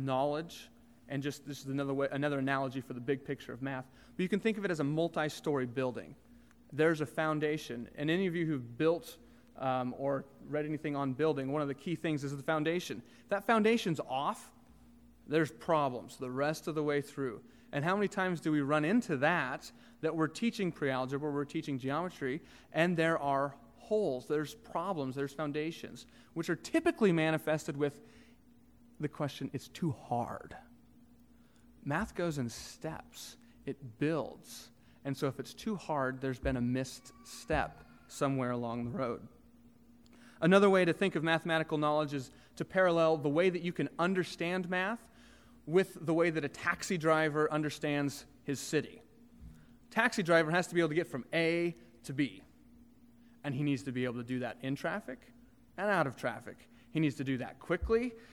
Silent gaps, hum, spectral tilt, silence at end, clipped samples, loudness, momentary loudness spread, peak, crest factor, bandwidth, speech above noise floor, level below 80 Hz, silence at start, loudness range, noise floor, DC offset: none; none; -6 dB/octave; 0 s; under 0.1%; -34 LUFS; 14 LU; -12 dBFS; 22 dB; 17.5 kHz; 29 dB; -60 dBFS; 0 s; 7 LU; -63 dBFS; under 0.1%